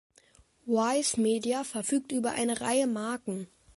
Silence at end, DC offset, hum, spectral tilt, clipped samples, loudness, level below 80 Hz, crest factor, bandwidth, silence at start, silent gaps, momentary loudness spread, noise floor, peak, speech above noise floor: 0.3 s; under 0.1%; none; -3.5 dB/octave; under 0.1%; -29 LUFS; -68 dBFS; 16 dB; 12 kHz; 0.65 s; none; 9 LU; -62 dBFS; -14 dBFS; 33 dB